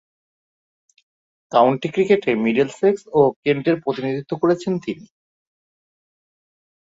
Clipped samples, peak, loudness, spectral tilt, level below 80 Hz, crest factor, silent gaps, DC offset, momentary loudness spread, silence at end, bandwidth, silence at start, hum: under 0.1%; -2 dBFS; -19 LUFS; -7 dB/octave; -64 dBFS; 20 dB; 3.36-3.43 s; under 0.1%; 8 LU; 1.95 s; 8 kHz; 1.5 s; none